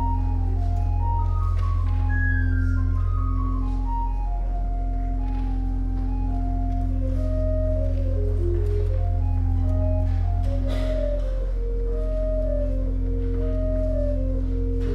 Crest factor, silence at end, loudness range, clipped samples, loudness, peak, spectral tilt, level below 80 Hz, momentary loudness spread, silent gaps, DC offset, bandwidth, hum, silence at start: 10 dB; 0 s; 3 LU; under 0.1%; -26 LUFS; -12 dBFS; -9.5 dB/octave; -24 dBFS; 5 LU; none; under 0.1%; 4 kHz; none; 0 s